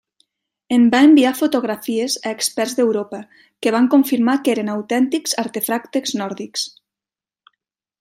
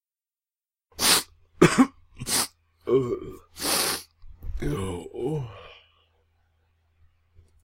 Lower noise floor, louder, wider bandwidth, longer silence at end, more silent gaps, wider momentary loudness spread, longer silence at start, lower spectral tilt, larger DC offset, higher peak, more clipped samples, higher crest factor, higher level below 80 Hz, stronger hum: about the same, under -90 dBFS vs under -90 dBFS; first, -18 LUFS vs -24 LUFS; about the same, 16 kHz vs 16 kHz; second, 1.35 s vs 1.9 s; neither; second, 13 LU vs 21 LU; second, 0.7 s vs 1 s; about the same, -3.5 dB/octave vs -3.5 dB/octave; neither; about the same, -4 dBFS vs -4 dBFS; neither; second, 16 dB vs 24 dB; second, -68 dBFS vs -44 dBFS; neither